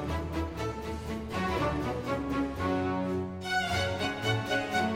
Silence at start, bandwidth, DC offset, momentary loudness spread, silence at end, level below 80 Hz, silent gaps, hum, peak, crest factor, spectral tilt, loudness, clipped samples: 0 s; 16.5 kHz; under 0.1%; 6 LU; 0 s; -44 dBFS; none; none; -16 dBFS; 14 dB; -5.5 dB/octave; -31 LUFS; under 0.1%